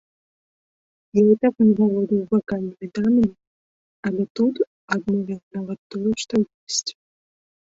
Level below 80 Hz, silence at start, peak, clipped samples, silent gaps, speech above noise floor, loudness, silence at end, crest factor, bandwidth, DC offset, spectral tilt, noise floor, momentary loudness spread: -58 dBFS; 1.15 s; -4 dBFS; under 0.1%; 3.47-4.03 s, 4.30-4.35 s, 4.67-4.88 s, 5.43-5.51 s, 5.79-5.90 s, 6.54-6.67 s; over 69 dB; -22 LUFS; 0.85 s; 18 dB; 8 kHz; under 0.1%; -5.5 dB/octave; under -90 dBFS; 13 LU